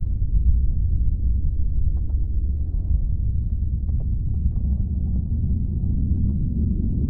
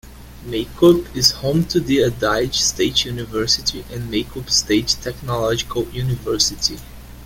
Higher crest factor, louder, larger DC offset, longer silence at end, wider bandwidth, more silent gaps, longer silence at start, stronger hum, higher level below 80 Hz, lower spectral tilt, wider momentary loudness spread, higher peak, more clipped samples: second, 14 dB vs 20 dB; second, -25 LUFS vs -18 LUFS; neither; about the same, 0 s vs 0 s; second, 0.9 kHz vs 17 kHz; neither; about the same, 0 s vs 0.05 s; neither; first, -22 dBFS vs -38 dBFS; first, -15.5 dB/octave vs -3.5 dB/octave; second, 3 LU vs 10 LU; second, -6 dBFS vs 0 dBFS; neither